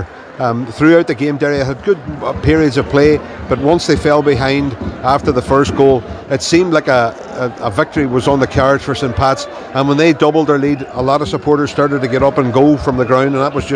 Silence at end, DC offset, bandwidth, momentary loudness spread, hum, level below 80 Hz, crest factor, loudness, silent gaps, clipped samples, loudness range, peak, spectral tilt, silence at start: 0 s; under 0.1%; 10.5 kHz; 7 LU; none; -34 dBFS; 12 dB; -13 LUFS; none; 0.3%; 1 LU; 0 dBFS; -6 dB/octave; 0 s